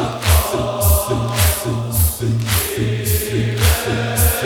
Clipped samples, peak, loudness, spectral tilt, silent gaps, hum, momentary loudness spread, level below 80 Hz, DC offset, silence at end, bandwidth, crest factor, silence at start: under 0.1%; -2 dBFS; -17 LUFS; -4.5 dB/octave; none; none; 4 LU; -24 dBFS; under 0.1%; 0 s; 18 kHz; 16 dB; 0 s